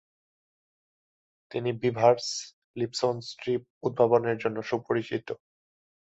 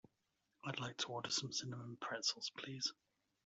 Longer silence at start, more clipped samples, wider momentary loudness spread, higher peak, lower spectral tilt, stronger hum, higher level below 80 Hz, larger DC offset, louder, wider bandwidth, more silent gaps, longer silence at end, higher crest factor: first, 1.5 s vs 0.65 s; neither; first, 13 LU vs 8 LU; first, -6 dBFS vs -24 dBFS; first, -5 dB/octave vs -2.5 dB/octave; neither; first, -70 dBFS vs -84 dBFS; neither; first, -28 LUFS vs -43 LUFS; about the same, 8.2 kHz vs 8.2 kHz; first, 2.53-2.74 s, 3.70-3.81 s vs none; first, 0.75 s vs 0.5 s; about the same, 22 dB vs 22 dB